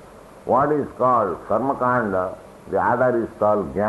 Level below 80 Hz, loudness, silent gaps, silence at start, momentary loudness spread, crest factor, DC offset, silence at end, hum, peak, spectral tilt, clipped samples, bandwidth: -52 dBFS; -21 LUFS; none; 0 s; 8 LU; 14 dB; under 0.1%; 0 s; none; -6 dBFS; -8.5 dB/octave; under 0.1%; 12 kHz